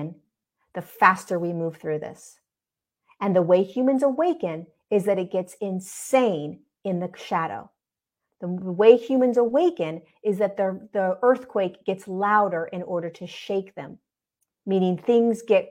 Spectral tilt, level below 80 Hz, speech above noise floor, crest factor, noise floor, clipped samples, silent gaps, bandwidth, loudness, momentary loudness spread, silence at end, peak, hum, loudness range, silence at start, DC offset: -6.5 dB/octave; -74 dBFS; 67 dB; 22 dB; -90 dBFS; under 0.1%; none; 16 kHz; -23 LUFS; 17 LU; 0.05 s; 0 dBFS; none; 5 LU; 0 s; under 0.1%